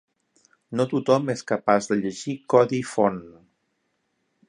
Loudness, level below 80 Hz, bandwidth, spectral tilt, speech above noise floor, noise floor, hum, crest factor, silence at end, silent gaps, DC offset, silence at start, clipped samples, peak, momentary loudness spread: -23 LUFS; -66 dBFS; 11 kHz; -6 dB/octave; 51 dB; -73 dBFS; none; 22 dB; 1.2 s; none; under 0.1%; 0.7 s; under 0.1%; -2 dBFS; 10 LU